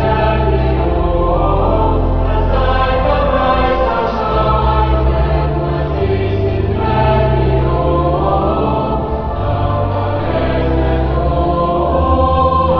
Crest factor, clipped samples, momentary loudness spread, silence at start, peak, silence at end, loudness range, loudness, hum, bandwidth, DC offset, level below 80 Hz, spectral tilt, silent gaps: 12 dB; under 0.1%; 4 LU; 0 s; -2 dBFS; 0 s; 2 LU; -15 LUFS; none; 5.4 kHz; under 0.1%; -18 dBFS; -9.5 dB/octave; none